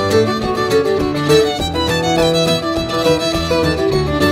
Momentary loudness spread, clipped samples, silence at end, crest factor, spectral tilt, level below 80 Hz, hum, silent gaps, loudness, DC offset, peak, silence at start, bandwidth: 4 LU; under 0.1%; 0 s; 14 dB; -5 dB/octave; -32 dBFS; none; none; -15 LUFS; under 0.1%; 0 dBFS; 0 s; 16 kHz